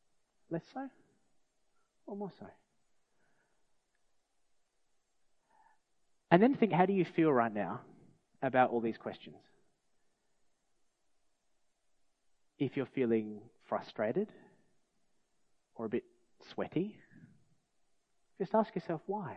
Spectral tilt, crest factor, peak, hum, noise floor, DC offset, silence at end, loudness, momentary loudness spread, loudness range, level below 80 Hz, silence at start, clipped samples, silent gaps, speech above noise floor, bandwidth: -9 dB/octave; 30 dB; -8 dBFS; none; -75 dBFS; under 0.1%; 0 s; -34 LUFS; 17 LU; 21 LU; -82 dBFS; 0.5 s; under 0.1%; none; 42 dB; 6.6 kHz